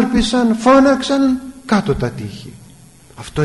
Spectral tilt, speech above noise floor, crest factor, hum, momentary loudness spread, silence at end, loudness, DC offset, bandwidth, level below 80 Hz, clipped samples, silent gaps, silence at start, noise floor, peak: -5.5 dB/octave; 29 dB; 12 dB; none; 19 LU; 0 s; -15 LUFS; 0.2%; 11.5 kHz; -36 dBFS; under 0.1%; none; 0 s; -43 dBFS; -4 dBFS